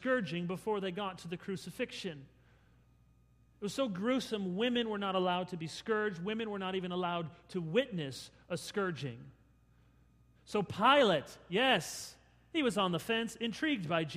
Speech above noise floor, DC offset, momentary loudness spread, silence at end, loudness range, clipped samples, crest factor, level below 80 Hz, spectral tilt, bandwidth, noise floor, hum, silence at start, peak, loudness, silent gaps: 31 dB; under 0.1%; 13 LU; 0 s; 8 LU; under 0.1%; 22 dB; -68 dBFS; -5 dB/octave; 15.5 kHz; -66 dBFS; none; 0 s; -14 dBFS; -35 LUFS; none